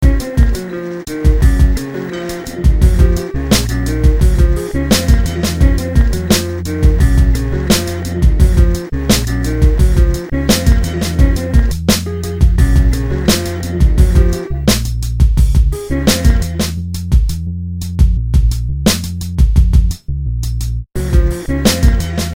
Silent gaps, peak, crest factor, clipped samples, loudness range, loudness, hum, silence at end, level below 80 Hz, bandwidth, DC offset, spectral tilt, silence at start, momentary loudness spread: none; 0 dBFS; 12 dB; 0.1%; 2 LU; -14 LUFS; none; 0 s; -14 dBFS; 16.5 kHz; under 0.1%; -5.5 dB/octave; 0 s; 8 LU